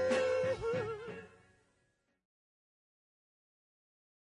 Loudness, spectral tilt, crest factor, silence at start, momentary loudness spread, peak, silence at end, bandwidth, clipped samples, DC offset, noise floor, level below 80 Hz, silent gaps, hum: -35 LUFS; -5 dB/octave; 20 dB; 0 s; 16 LU; -20 dBFS; 3.1 s; 10 kHz; under 0.1%; under 0.1%; -78 dBFS; -68 dBFS; none; none